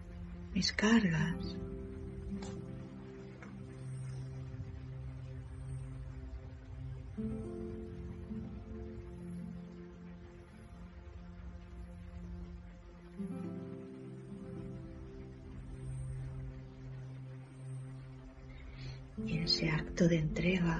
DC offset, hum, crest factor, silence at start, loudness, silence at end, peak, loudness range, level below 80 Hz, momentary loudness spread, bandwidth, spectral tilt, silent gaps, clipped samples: under 0.1%; none; 24 dB; 0 s; -40 LUFS; 0 s; -16 dBFS; 13 LU; -52 dBFS; 19 LU; 11 kHz; -5.5 dB/octave; none; under 0.1%